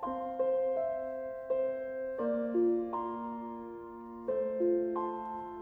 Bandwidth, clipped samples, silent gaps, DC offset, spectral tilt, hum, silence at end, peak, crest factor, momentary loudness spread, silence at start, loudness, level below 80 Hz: 3.4 kHz; under 0.1%; none; under 0.1%; -9.5 dB/octave; none; 0 s; -22 dBFS; 12 dB; 11 LU; 0 s; -34 LUFS; -68 dBFS